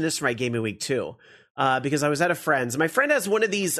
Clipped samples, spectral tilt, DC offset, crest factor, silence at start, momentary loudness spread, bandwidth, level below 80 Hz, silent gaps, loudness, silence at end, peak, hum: under 0.1%; -4 dB/octave; under 0.1%; 18 dB; 0 s; 6 LU; 13.5 kHz; -66 dBFS; 1.50-1.55 s; -24 LUFS; 0 s; -8 dBFS; none